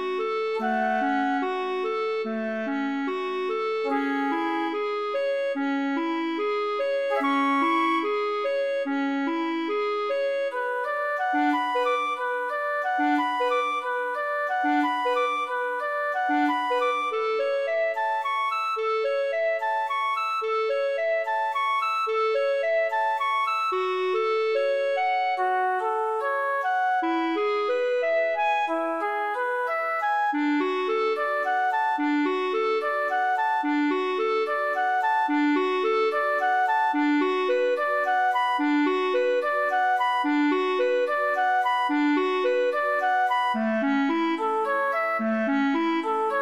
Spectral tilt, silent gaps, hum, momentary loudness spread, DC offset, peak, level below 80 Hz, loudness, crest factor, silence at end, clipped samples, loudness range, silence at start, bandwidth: -4.5 dB/octave; none; none; 4 LU; under 0.1%; -12 dBFS; -80 dBFS; -25 LUFS; 12 dB; 0 s; under 0.1%; 3 LU; 0 s; 14 kHz